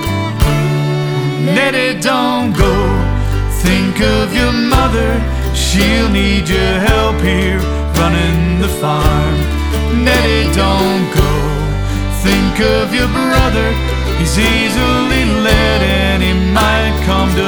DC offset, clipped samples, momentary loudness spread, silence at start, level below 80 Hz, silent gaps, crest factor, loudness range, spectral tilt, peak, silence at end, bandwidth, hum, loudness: under 0.1%; under 0.1%; 5 LU; 0 s; -18 dBFS; none; 12 dB; 1 LU; -5.5 dB/octave; 0 dBFS; 0 s; over 20 kHz; none; -13 LUFS